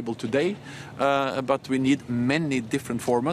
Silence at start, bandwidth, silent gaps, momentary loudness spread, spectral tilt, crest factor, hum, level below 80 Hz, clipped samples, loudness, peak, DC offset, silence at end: 0 s; 14.5 kHz; none; 5 LU; -6 dB/octave; 18 dB; none; -62 dBFS; under 0.1%; -25 LUFS; -8 dBFS; under 0.1%; 0 s